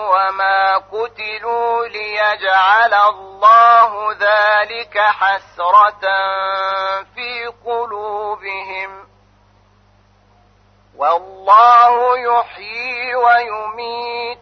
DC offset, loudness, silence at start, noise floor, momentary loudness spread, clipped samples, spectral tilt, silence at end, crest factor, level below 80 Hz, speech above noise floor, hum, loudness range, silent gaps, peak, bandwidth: under 0.1%; -14 LUFS; 0 s; -52 dBFS; 15 LU; under 0.1%; -2.5 dB/octave; 0.05 s; 14 dB; -58 dBFS; 38 dB; 50 Hz at -55 dBFS; 13 LU; none; 0 dBFS; 6.4 kHz